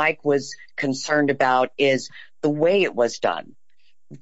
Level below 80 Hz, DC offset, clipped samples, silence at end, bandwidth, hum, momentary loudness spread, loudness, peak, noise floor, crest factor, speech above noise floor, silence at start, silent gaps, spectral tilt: -72 dBFS; 0.5%; under 0.1%; 0.05 s; 8 kHz; none; 8 LU; -21 LUFS; -6 dBFS; -68 dBFS; 16 dB; 47 dB; 0 s; none; -4.5 dB/octave